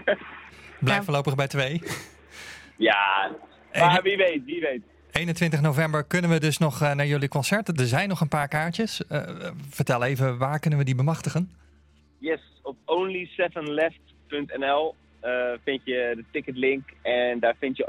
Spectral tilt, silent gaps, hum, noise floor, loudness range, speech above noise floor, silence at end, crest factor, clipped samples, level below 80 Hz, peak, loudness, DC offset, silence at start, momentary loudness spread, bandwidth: -5.5 dB/octave; none; none; -58 dBFS; 5 LU; 33 dB; 0 s; 22 dB; under 0.1%; -58 dBFS; -4 dBFS; -25 LUFS; under 0.1%; 0 s; 13 LU; 16 kHz